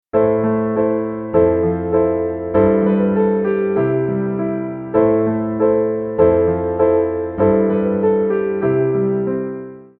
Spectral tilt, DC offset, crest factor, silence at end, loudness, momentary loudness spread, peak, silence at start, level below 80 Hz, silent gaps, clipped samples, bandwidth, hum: -13 dB/octave; under 0.1%; 14 dB; 0.15 s; -17 LUFS; 6 LU; -2 dBFS; 0.15 s; -44 dBFS; none; under 0.1%; 3.4 kHz; none